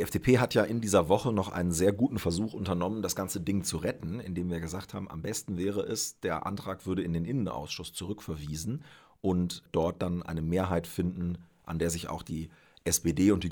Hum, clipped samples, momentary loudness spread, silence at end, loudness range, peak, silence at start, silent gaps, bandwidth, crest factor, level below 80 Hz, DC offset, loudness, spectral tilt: none; under 0.1%; 12 LU; 0 s; 5 LU; -10 dBFS; 0 s; none; over 20 kHz; 20 dB; -52 dBFS; under 0.1%; -31 LUFS; -5.5 dB/octave